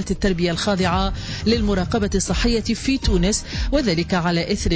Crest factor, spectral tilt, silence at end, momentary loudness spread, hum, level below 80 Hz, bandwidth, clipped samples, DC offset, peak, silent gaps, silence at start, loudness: 12 dB; -5 dB/octave; 0 s; 3 LU; none; -28 dBFS; 8 kHz; under 0.1%; under 0.1%; -8 dBFS; none; 0 s; -20 LUFS